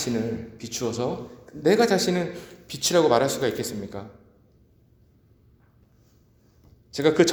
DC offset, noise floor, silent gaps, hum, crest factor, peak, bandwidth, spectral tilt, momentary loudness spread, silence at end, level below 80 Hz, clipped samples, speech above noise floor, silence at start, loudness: under 0.1%; -59 dBFS; none; none; 22 dB; -4 dBFS; over 20 kHz; -4 dB/octave; 18 LU; 0 s; -58 dBFS; under 0.1%; 35 dB; 0 s; -24 LUFS